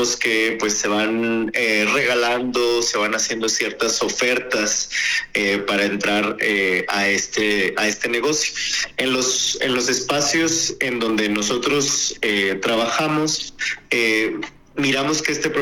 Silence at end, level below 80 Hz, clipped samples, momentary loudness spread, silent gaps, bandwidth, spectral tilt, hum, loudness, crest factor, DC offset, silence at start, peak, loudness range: 0 s; -54 dBFS; under 0.1%; 3 LU; none; 18 kHz; -2 dB/octave; none; -19 LUFS; 16 dB; under 0.1%; 0 s; -4 dBFS; 1 LU